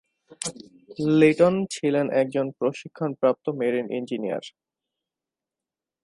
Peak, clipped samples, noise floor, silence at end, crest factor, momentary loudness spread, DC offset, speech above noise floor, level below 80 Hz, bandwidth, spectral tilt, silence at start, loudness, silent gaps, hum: -4 dBFS; under 0.1%; -89 dBFS; 1.55 s; 20 dB; 15 LU; under 0.1%; 66 dB; -68 dBFS; 11.5 kHz; -6 dB/octave; 0.3 s; -24 LUFS; none; none